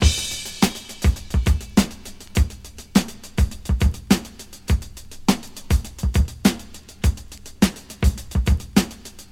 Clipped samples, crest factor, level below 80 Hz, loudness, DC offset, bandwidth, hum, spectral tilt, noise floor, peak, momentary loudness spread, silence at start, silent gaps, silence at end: under 0.1%; 20 dB; -26 dBFS; -23 LUFS; under 0.1%; 17 kHz; none; -5 dB/octave; -39 dBFS; 0 dBFS; 15 LU; 0 s; none; 0.1 s